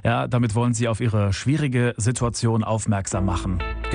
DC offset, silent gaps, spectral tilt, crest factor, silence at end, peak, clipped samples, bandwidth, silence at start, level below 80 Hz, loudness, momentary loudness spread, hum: under 0.1%; none; -6 dB/octave; 14 dB; 0 s; -8 dBFS; under 0.1%; 10 kHz; 0.05 s; -36 dBFS; -23 LUFS; 3 LU; none